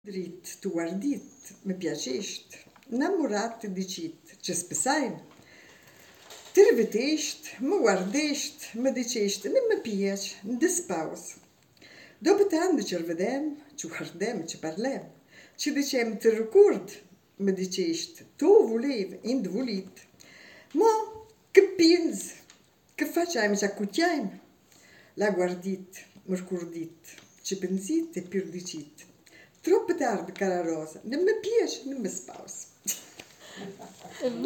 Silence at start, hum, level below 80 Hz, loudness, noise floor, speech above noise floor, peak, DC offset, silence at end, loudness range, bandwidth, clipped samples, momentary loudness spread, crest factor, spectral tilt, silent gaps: 0.05 s; none; -76 dBFS; -28 LUFS; -59 dBFS; 32 dB; -4 dBFS; under 0.1%; 0 s; 7 LU; 17 kHz; under 0.1%; 18 LU; 24 dB; -4 dB/octave; none